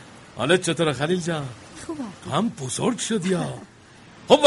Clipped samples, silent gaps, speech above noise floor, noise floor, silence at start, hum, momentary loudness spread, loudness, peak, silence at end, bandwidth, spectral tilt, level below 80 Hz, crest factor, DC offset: under 0.1%; none; 23 dB; -48 dBFS; 0 s; none; 17 LU; -24 LUFS; 0 dBFS; 0 s; 11.5 kHz; -4.5 dB/octave; -58 dBFS; 24 dB; under 0.1%